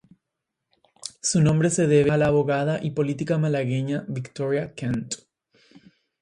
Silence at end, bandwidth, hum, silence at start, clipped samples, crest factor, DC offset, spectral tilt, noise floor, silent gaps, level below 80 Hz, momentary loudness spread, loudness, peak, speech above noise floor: 1.05 s; 11.5 kHz; none; 1.05 s; under 0.1%; 18 dB; under 0.1%; -6 dB/octave; -83 dBFS; none; -54 dBFS; 13 LU; -23 LUFS; -6 dBFS; 60 dB